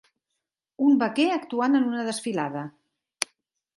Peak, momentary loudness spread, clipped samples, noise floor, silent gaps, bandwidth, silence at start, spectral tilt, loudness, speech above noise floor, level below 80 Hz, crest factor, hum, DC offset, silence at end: -4 dBFS; 11 LU; under 0.1%; -83 dBFS; none; 11.5 kHz; 0.8 s; -4 dB/octave; -25 LUFS; 59 dB; -80 dBFS; 24 dB; none; under 0.1%; 0.55 s